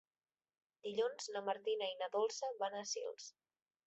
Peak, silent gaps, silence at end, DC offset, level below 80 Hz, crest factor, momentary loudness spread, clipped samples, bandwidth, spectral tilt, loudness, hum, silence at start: -26 dBFS; none; 0.55 s; under 0.1%; under -90 dBFS; 18 dB; 10 LU; under 0.1%; 8 kHz; -0.5 dB/octave; -41 LUFS; none; 0.85 s